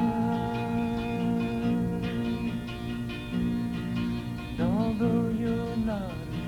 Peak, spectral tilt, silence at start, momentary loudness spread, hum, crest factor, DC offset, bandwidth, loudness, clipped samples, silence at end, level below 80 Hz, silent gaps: -14 dBFS; -8 dB/octave; 0 s; 8 LU; none; 14 dB; under 0.1%; 14.5 kHz; -30 LUFS; under 0.1%; 0 s; -44 dBFS; none